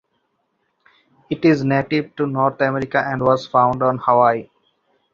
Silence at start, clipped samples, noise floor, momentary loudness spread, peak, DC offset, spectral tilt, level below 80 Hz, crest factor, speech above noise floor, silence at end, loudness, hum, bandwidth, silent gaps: 1.3 s; under 0.1%; -69 dBFS; 7 LU; -2 dBFS; under 0.1%; -8 dB/octave; -56 dBFS; 18 dB; 52 dB; 0.7 s; -18 LUFS; none; 7.4 kHz; none